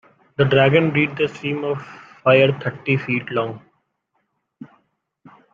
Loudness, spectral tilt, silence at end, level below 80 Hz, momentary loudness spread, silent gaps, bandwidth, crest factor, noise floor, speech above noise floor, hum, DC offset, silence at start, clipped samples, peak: -19 LUFS; -8 dB/octave; 0.9 s; -60 dBFS; 14 LU; none; 7.2 kHz; 20 dB; -71 dBFS; 53 dB; none; under 0.1%; 0.4 s; under 0.1%; -2 dBFS